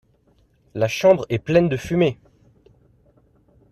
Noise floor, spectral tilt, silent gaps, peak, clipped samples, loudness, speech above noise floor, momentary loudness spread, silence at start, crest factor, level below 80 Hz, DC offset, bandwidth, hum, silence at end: -60 dBFS; -6.5 dB/octave; none; -4 dBFS; under 0.1%; -20 LUFS; 41 dB; 11 LU; 0.75 s; 20 dB; -52 dBFS; under 0.1%; 14 kHz; none; 1.6 s